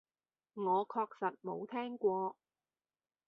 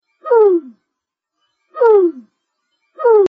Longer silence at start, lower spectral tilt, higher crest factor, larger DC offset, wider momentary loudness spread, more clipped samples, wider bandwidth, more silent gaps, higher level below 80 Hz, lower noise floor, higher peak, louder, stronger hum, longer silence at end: first, 0.55 s vs 0.25 s; about the same, -5 dB/octave vs -4.5 dB/octave; first, 18 dB vs 12 dB; neither; about the same, 8 LU vs 8 LU; neither; first, 5 kHz vs 3.6 kHz; neither; second, -84 dBFS vs -70 dBFS; first, under -90 dBFS vs -79 dBFS; second, -20 dBFS vs -2 dBFS; second, -38 LUFS vs -13 LUFS; neither; first, 0.95 s vs 0 s